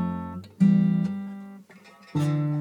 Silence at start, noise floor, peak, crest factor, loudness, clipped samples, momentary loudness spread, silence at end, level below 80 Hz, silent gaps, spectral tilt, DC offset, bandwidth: 0 s; -51 dBFS; -10 dBFS; 16 dB; -25 LUFS; under 0.1%; 18 LU; 0 s; -60 dBFS; none; -9 dB/octave; under 0.1%; 10.5 kHz